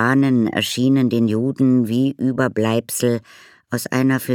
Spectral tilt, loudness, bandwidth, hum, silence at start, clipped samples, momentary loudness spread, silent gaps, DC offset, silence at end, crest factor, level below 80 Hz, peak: -5.5 dB/octave; -18 LUFS; 18 kHz; none; 0 s; under 0.1%; 5 LU; none; under 0.1%; 0 s; 16 dB; -64 dBFS; -2 dBFS